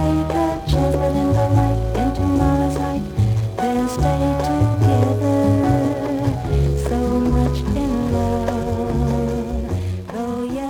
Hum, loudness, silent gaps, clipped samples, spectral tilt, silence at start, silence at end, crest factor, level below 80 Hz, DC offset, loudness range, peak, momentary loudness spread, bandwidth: none; -19 LUFS; none; under 0.1%; -8 dB/octave; 0 s; 0 s; 14 dB; -28 dBFS; under 0.1%; 2 LU; -4 dBFS; 6 LU; 17 kHz